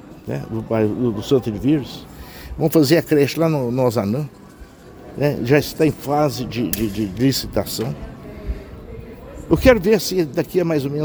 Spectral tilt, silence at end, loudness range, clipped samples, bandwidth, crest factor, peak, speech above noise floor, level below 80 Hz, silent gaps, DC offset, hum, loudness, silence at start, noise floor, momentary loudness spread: -6 dB/octave; 0 s; 3 LU; under 0.1%; over 20 kHz; 20 dB; 0 dBFS; 23 dB; -38 dBFS; none; under 0.1%; none; -19 LUFS; 0.05 s; -41 dBFS; 20 LU